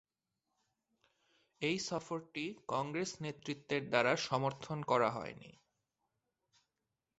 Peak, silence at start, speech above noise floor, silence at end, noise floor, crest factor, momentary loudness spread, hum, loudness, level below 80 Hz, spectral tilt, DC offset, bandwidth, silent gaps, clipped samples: -14 dBFS; 1.6 s; 52 dB; 1.7 s; -89 dBFS; 24 dB; 11 LU; none; -37 LUFS; -76 dBFS; -4.5 dB/octave; under 0.1%; 8.2 kHz; none; under 0.1%